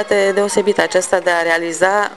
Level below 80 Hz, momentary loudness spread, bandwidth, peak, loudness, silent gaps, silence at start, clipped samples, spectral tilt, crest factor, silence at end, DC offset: -56 dBFS; 1 LU; 12.5 kHz; 0 dBFS; -15 LUFS; none; 0 s; under 0.1%; -3 dB/octave; 16 dB; 0 s; 0.3%